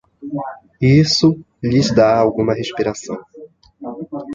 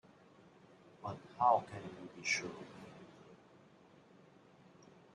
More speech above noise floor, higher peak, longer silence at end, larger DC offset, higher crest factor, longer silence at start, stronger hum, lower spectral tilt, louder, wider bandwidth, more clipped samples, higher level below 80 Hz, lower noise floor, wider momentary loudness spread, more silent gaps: about the same, 25 dB vs 26 dB; first, -2 dBFS vs -18 dBFS; second, 0 s vs 1.8 s; neither; second, 16 dB vs 24 dB; second, 0.2 s vs 1 s; neither; first, -6 dB/octave vs -3 dB/octave; first, -16 LUFS vs -37 LUFS; second, 7.8 kHz vs 10.5 kHz; neither; first, -46 dBFS vs -80 dBFS; second, -40 dBFS vs -64 dBFS; second, 18 LU vs 26 LU; neither